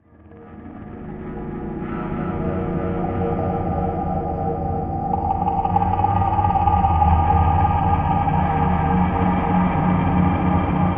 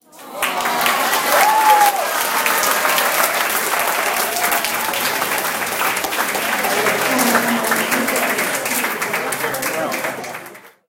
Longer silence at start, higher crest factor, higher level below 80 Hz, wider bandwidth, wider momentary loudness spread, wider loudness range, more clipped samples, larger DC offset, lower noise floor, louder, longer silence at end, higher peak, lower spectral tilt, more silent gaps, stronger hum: about the same, 0.25 s vs 0.15 s; about the same, 16 dB vs 18 dB; first, -30 dBFS vs -62 dBFS; second, 3.7 kHz vs 17 kHz; first, 13 LU vs 7 LU; first, 7 LU vs 3 LU; neither; neither; first, -44 dBFS vs -38 dBFS; second, -20 LUFS vs -17 LUFS; second, 0 s vs 0.2 s; second, -4 dBFS vs 0 dBFS; first, -11.5 dB/octave vs -1 dB/octave; neither; neither